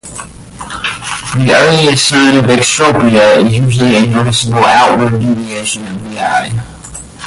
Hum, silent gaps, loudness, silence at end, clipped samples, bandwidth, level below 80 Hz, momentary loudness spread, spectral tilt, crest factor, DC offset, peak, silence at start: none; none; -9 LUFS; 0 s; under 0.1%; 11.5 kHz; -38 dBFS; 18 LU; -4.5 dB/octave; 10 dB; under 0.1%; 0 dBFS; 0.05 s